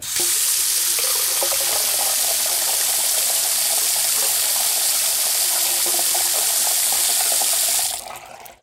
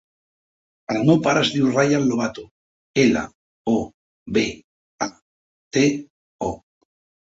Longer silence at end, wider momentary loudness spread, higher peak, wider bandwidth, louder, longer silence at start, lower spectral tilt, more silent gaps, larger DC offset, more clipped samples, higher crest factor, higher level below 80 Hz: second, 0.1 s vs 0.75 s; second, 1 LU vs 17 LU; about the same, -6 dBFS vs -4 dBFS; first, 17.5 kHz vs 7.8 kHz; first, -16 LUFS vs -21 LUFS; second, 0 s vs 0.9 s; second, 2.5 dB/octave vs -5 dB/octave; second, none vs 2.51-2.94 s, 3.35-3.65 s, 3.94-4.26 s, 4.64-4.98 s, 5.22-5.71 s, 6.10-6.39 s; neither; neither; second, 14 dB vs 20 dB; second, -60 dBFS vs -54 dBFS